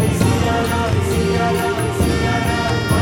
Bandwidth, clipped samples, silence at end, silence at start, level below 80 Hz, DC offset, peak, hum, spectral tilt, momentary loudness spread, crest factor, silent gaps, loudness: 16.5 kHz; under 0.1%; 0 s; 0 s; -30 dBFS; under 0.1%; -4 dBFS; none; -5.5 dB/octave; 2 LU; 14 dB; none; -18 LUFS